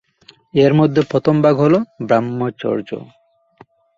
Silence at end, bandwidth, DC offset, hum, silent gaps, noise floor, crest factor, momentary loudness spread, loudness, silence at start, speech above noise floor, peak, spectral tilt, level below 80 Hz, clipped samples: 0.9 s; 7.4 kHz; under 0.1%; none; none; -50 dBFS; 16 dB; 10 LU; -16 LUFS; 0.55 s; 35 dB; -2 dBFS; -8.5 dB/octave; -56 dBFS; under 0.1%